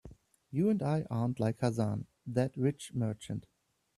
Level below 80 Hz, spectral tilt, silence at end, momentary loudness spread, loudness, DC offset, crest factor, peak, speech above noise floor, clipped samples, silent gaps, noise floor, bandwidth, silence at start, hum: -64 dBFS; -7.5 dB/octave; 0.55 s; 10 LU; -34 LUFS; under 0.1%; 18 dB; -14 dBFS; 23 dB; under 0.1%; none; -56 dBFS; 13 kHz; 0.05 s; none